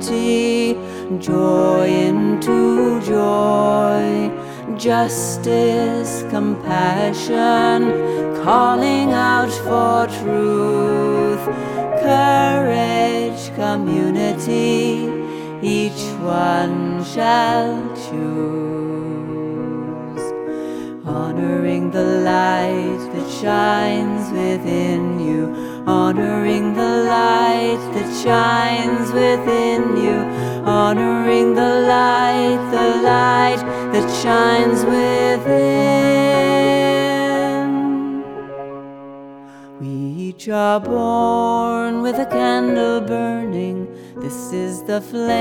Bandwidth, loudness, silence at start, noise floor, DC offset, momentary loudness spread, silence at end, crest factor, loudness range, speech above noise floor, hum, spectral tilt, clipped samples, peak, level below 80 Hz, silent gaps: 17.5 kHz; -17 LUFS; 0 s; -38 dBFS; under 0.1%; 11 LU; 0 s; 16 dB; 6 LU; 21 dB; none; -5.5 dB/octave; under 0.1%; 0 dBFS; -52 dBFS; none